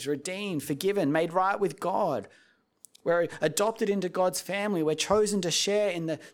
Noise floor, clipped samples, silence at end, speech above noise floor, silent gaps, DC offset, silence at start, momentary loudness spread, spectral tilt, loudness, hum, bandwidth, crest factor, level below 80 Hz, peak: -59 dBFS; under 0.1%; 0.05 s; 31 dB; none; under 0.1%; 0 s; 7 LU; -4 dB/octave; -28 LUFS; none; 18.5 kHz; 20 dB; -66 dBFS; -8 dBFS